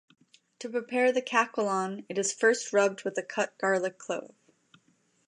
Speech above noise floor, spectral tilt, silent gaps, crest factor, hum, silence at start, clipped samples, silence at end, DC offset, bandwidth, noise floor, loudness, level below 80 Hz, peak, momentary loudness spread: 40 dB; -3 dB/octave; none; 18 dB; none; 0.6 s; under 0.1%; 1 s; under 0.1%; 11 kHz; -69 dBFS; -29 LUFS; -86 dBFS; -12 dBFS; 10 LU